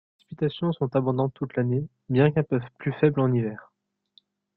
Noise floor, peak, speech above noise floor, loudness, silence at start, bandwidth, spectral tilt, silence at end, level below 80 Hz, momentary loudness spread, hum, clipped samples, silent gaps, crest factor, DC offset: -63 dBFS; -6 dBFS; 39 dB; -25 LUFS; 0.3 s; 4.5 kHz; -11.5 dB/octave; 0.95 s; -60 dBFS; 8 LU; none; under 0.1%; none; 20 dB; under 0.1%